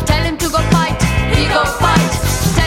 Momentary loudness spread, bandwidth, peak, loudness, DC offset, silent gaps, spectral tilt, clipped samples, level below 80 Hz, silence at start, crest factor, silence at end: 3 LU; 16.5 kHz; 0 dBFS; -14 LUFS; under 0.1%; none; -4.5 dB/octave; under 0.1%; -22 dBFS; 0 s; 14 dB; 0 s